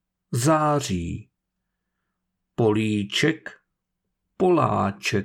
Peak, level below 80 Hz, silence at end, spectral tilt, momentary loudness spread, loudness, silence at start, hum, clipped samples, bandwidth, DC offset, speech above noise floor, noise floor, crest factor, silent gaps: -8 dBFS; -54 dBFS; 0 s; -5.5 dB/octave; 14 LU; -23 LUFS; 0.3 s; none; under 0.1%; 18.5 kHz; under 0.1%; 58 dB; -80 dBFS; 16 dB; none